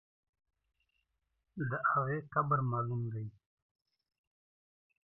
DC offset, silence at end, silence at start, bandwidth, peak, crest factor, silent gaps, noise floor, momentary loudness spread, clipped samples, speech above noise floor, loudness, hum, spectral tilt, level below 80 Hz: under 0.1%; 1.85 s; 1.55 s; 3 kHz; -18 dBFS; 22 dB; none; -83 dBFS; 12 LU; under 0.1%; 49 dB; -35 LUFS; none; -9.5 dB/octave; -76 dBFS